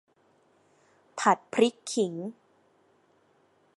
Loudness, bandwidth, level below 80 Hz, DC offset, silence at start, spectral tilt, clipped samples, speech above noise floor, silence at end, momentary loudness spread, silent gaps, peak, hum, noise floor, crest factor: -27 LUFS; 11.5 kHz; -84 dBFS; under 0.1%; 1.15 s; -4 dB/octave; under 0.1%; 39 dB; 1.45 s; 16 LU; none; -6 dBFS; none; -66 dBFS; 24 dB